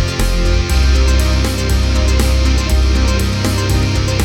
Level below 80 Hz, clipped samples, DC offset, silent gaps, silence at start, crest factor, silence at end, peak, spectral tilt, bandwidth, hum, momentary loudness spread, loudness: -14 dBFS; under 0.1%; under 0.1%; none; 0 s; 12 dB; 0 s; 0 dBFS; -5 dB/octave; 16 kHz; none; 3 LU; -14 LUFS